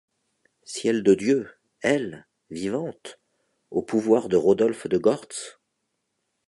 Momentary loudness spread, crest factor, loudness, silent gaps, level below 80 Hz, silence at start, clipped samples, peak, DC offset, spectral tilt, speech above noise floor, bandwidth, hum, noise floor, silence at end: 18 LU; 18 dB; -23 LUFS; none; -64 dBFS; 0.7 s; under 0.1%; -6 dBFS; under 0.1%; -5.5 dB/octave; 54 dB; 11.5 kHz; none; -77 dBFS; 0.95 s